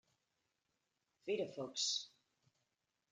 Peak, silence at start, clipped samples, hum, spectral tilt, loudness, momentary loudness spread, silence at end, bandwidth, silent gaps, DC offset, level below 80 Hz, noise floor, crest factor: -28 dBFS; 1.25 s; under 0.1%; none; -1.5 dB/octave; -41 LUFS; 14 LU; 1.05 s; 11 kHz; none; under 0.1%; under -90 dBFS; -87 dBFS; 20 dB